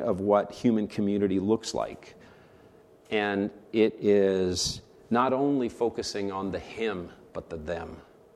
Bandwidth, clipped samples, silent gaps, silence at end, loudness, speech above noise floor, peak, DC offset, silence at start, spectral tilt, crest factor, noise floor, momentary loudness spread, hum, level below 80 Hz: 13 kHz; under 0.1%; none; 0.35 s; -28 LUFS; 28 dB; -10 dBFS; under 0.1%; 0 s; -5 dB/octave; 18 dB; -55 dBFS; 14 LU; none; -58 dBFS